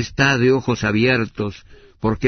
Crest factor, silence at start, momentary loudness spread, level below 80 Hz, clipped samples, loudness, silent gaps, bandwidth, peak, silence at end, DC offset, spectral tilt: 18 dB; 0 s; 11 LU; -42 dBFS; under 0.1%; -18 LUFS; none; 6.6 kHz; -2 dBFS; 0 s; under 0.1%; -5.5 dB/octave